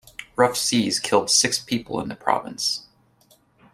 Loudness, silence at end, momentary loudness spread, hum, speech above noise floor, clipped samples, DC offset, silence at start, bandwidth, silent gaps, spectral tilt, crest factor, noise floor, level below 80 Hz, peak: -21 LUFS; 0.9 s; 10 LU; none; 37 dB; under 0.1%; under 0.1%; 0.2 s; 16 kHz; none; -2.5 dB/octave; 22 dB; -59 dBFS; -60 dBFS; -2 dBFS